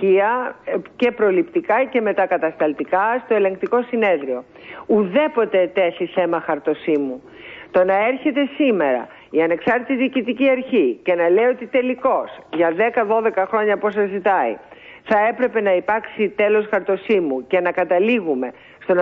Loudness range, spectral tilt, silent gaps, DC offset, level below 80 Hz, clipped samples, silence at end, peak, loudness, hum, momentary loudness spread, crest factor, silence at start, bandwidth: 1 LU; -8 dB/octave; none; under 0.1%; -62 dBFS; under 0.1%; 0 s; -4 dBFS; -19 LUFS; none; 7 LU; 14 dB; 0 s; 5.4 kHz